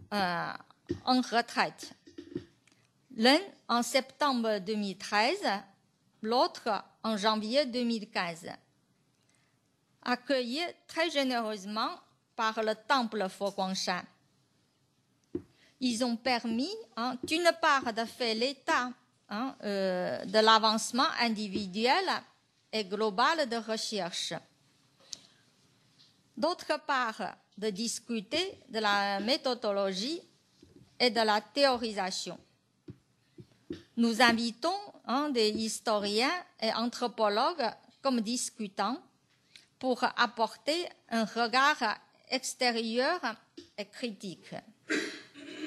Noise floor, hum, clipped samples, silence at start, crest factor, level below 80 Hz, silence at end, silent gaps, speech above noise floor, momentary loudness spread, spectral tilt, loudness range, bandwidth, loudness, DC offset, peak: -72 dBFS; none; under 0.1%; 0 s; 24 dB; -76 dBFS; 0 s; none; 41 dB; 15 LU; -3 dB/octave; 6 LU; 13 kHz; -31 LUFS; under 0.1%; -8 dBFS